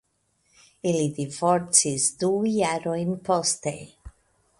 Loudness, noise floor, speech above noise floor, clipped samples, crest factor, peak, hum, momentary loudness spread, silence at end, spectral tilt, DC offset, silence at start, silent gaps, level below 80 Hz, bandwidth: -24 LUFS; -70 dBFS; 45 dB; under 0.1%; 24 dB; -2 dBFS; none; 10 LU; 0.5 s; -3.5 dB/octave; under 0.1%; 0.85 s; none; -56 dBFS; 11.5 kHz